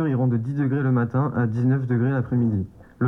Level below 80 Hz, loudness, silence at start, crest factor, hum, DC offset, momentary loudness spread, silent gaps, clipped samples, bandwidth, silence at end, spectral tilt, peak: -56 dBFS; -23 LUFS; 0 s; 12 dB; none; under 0.1%; 3 LU; none; under 0.1%; 3.7 kHz; 0 s; -11.5 dB/octave; -10 dBFS